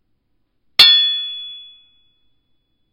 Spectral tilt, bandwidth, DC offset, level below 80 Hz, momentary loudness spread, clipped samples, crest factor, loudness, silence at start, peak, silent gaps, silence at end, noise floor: 1 dB/octave; 16 kHz; under 0.1%; -60 dBFS; 21 LU; under 0.1%; 20 dB; -11 LUFS; 0.8 s; 0 dBFS; none; 1.35 s; -66 dBFS